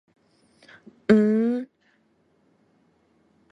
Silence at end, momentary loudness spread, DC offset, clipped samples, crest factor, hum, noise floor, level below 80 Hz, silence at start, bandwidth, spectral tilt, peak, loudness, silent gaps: 1.85 s; 16 LU; under 0.1%; under 0.1%; 22 dB; none; -65 dBFS; -66 dBFS; 1.1 s; 7.8 kHz; -8.5 dB/octave; -4 dBFS; -22 LUFS; none